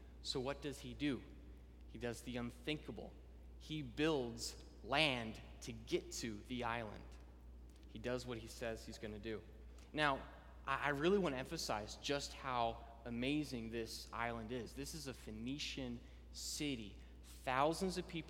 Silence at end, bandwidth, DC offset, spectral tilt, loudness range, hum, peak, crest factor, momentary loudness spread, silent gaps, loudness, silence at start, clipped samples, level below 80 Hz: 0 s; 17 kHz; under 0.1%; -4 dB/octave; 6 LU; none; -18 dBFS; 26 dB; 20 LU; none; -43 LUFS; 0 s; under 0.1%; -58 dBFS